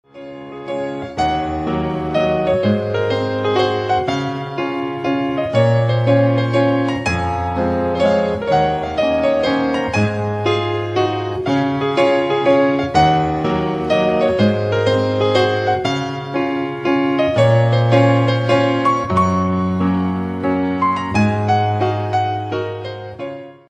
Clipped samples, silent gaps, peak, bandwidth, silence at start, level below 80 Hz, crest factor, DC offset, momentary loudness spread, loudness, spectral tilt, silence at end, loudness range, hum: under 0.1%; none; -2 dBFS; 9.6 kHz; 0.15 s; -42 dBFS; 16 dB; under 0.1%; 8 LU; -17 LUFS; -7 dB/octave; 0.15 s; 3 LU; none